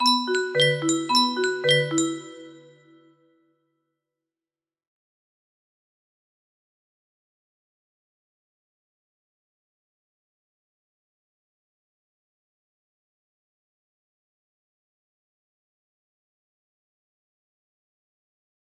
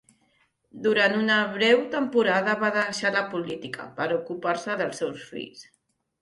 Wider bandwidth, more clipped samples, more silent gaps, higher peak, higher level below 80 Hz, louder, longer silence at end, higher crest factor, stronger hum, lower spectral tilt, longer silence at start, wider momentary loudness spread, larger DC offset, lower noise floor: first, 13.5 kHz vs 11.5 kHz; neither; neither; about the same, -6 dBFS vs -8 dBFS; second, -80 dBFS vs -70 dBFS; first, -21 LUFS vs -24 LUFS; first, 16.15 s vs 0.6 s; first, 26 dB vs 18 dB; neither; about the same, -3 dB/octave vs -4 dB/octave; second, 0 s vs 0.75 s; second, 8 LU vs 14 LU; neither; first, under -90 dBFS vs -68 dBFS